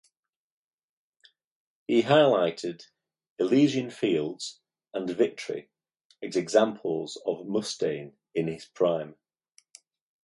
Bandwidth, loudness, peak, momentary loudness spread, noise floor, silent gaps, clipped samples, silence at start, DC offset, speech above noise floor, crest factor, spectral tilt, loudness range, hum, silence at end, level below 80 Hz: 11.5 kHz; -27 LUFS; -8 dBFS; 16 LU; -82 dBFS; 3.30-3.36 s, 6.05-6.10 s; under 0.1%; 1.9 s; under 0.1%; 56 dB; 22 dB; -5.5 dB/octave; 4 LU; none; 1.15 s; -72 dBFS